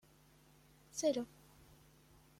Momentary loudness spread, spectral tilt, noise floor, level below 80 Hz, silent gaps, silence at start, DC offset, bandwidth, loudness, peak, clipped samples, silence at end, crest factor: 27 LU; -3.5 dB/octave; -67 dBFS; -74 dBFS; none; 0.95 s; under 0.1%; 16.5 kHz; -40 LUFS; -24 dBFS; under 0.1%; 1.15 s; 22 dB